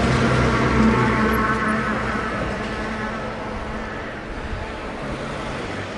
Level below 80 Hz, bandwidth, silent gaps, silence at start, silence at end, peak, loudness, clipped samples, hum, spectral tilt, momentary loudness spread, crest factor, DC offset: -34 dBFS; 12 kHz; none; 0 s; 0 s; -4 dBFS; -22 LUFS; under 0.1%; none; -6 dB/octave; 12 LU; 18 dB; under 0.1%